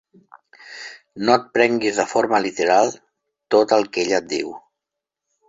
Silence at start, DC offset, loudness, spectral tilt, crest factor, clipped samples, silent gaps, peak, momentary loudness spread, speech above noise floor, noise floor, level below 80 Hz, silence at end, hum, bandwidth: 0.65 s; under 0.1%; -19 LUFS; -3.5 dB/octave; 20 dB; under 0.1%; none; -2 dBFS; 19 LU; 65 dB; -84 dBFS; -64 dBFS; 0.9 s; none; 8 kHz